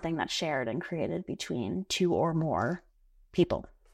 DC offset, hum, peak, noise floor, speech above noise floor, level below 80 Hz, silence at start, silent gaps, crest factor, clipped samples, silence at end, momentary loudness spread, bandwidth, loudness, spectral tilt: under 0.1%; none; -12 dBFS; -59 dBFS; 29 dB; -58 dBFS; 0 s; none; 20 dB; under 0.1%; 0.25 s; 8 LU; 14 kHz; -31 LUFS; -5.5 dB/octave